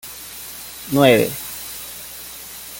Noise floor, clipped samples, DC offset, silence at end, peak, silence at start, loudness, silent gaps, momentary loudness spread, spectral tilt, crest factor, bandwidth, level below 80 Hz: -35 dBFS; under 0.1%; under 0.1%; 0 s; -2 dBFS; 0.05 s; -18 LUFS; none; 18 LU; -4.5 dB/octave; 20 dB; 17 kHz; -52 dBFS